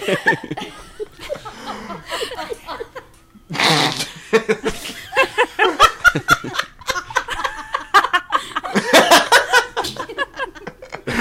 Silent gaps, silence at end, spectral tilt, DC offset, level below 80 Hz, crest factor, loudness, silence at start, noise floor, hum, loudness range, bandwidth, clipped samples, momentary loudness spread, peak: none; 0 s; -2.5 dB/octave; under 0.1%; -44 dBFS; 18 dB; -17 LUFS; 0 s; -46 dBFS; none; 7 LU; 16.5 kHz; under 0.1%; 19 LU; 0 dBFS